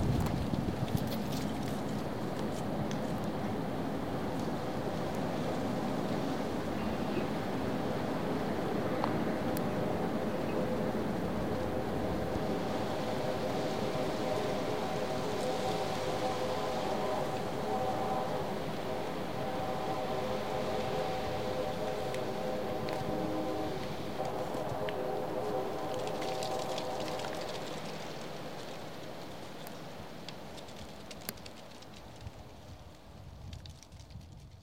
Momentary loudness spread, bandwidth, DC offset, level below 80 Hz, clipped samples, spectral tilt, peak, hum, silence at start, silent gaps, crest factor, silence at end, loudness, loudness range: 12 LU; 16.5 kHz; 0.7%; -54 dBFS; under 0.1%; -6 dB/octave; -14 dBFS; none; 0 s; none; 20 dB; 0 s; -36 LUFS; 11 LU